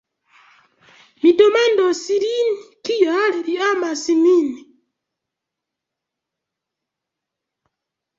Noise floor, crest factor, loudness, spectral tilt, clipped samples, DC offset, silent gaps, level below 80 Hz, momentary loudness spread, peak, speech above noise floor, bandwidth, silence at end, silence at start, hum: -83 dBFS; 18 dB; -17 LUFS; -2.5 dB/octave; under 0.1%; under 0.1%; none; -70 dBFS; 10 LU; -2 dBFS; 66 dB; 7.8 kHz; 3.6 s; 1.25 s; none